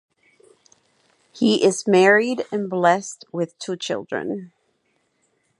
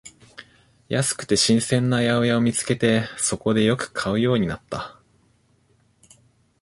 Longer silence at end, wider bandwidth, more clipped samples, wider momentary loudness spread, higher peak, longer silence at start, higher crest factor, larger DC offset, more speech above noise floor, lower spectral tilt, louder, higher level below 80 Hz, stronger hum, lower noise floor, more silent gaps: second, 1.1 s vs 1.7 s; about the same, 11.5 kHz vs 11.5 kHz; neither; first, 14 LU vs 11 LU; about the same, -2 dBFS vs -4 dBFS; first, 1.35 s vs 0.05 s; about the same, 20 dB vs 18 dB; neither; first, 48 dB vs 41 dB; about the same, -4.5 dB/octave vs -4.5 dB/octave; about the same, -20 LUFS vs -21 LUFS; second, -74 dBFS vs -52 dBFS; neither; first, -68 dBFS vs -62 dBFS; neither